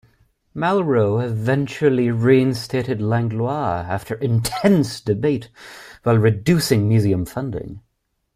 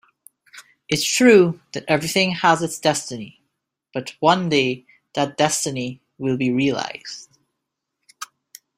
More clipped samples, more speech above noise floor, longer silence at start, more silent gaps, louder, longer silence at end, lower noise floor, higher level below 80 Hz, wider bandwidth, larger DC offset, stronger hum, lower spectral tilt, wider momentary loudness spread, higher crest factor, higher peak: neither; second, 53 dB vs 60 dB; about the same, 0.55 s vs 0.55 s; neither; about the same, -19 LUFS vs -19 LUFS; about the same, 0.55 s vs 0.55 s; second, -71 dBFS vs -80 dBFS; first, -50 dBFS vs -62 dBFS; about the same, 15.5 kHz vs 16 kHz; neither; neither; first, -6.5 dB/octave vs -4 dB/octave; second, 10 LU vs 19 LU; about the same, 16 dB vs 20 dB; second, -4 dBFS vs 0 dBFS